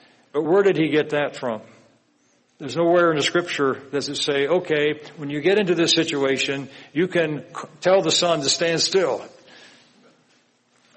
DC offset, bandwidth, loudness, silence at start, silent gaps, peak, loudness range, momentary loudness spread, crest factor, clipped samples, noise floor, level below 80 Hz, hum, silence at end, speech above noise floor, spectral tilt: under 0.1%; 8.8 kHz; -21 LUFS; 0.35 s; none; -4 dBFS; 2 LU; 12 LU; 18 dB; under 0.1%; -62 dBFS; -68 dBFS; none; 1.7 s; 42 dB; -3.5 dB/octave